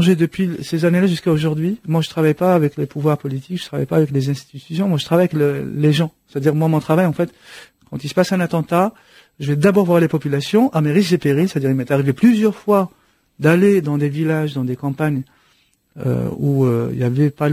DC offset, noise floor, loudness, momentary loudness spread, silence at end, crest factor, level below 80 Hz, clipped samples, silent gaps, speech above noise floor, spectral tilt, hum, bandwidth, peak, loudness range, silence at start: under 0.1%; -59 dBFS; -18 LUFS; 9 LU; 0 s; 16 dB; -54 dBFS; under 0.1%; none; 42 dB; -7.5 dB/octave; none; 16 kHz; -2 dBFS; 3 LU; 0 s